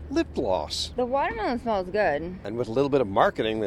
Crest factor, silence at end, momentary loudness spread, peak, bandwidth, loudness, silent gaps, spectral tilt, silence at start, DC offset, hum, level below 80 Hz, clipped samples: 20 dB; 0 s; 6 LU; -6 dBFS; 14 kHz; -26 LUFS; none; -5 dB/octave; 0 s; under 0.1%; none; -46 dBFS; under 0.1%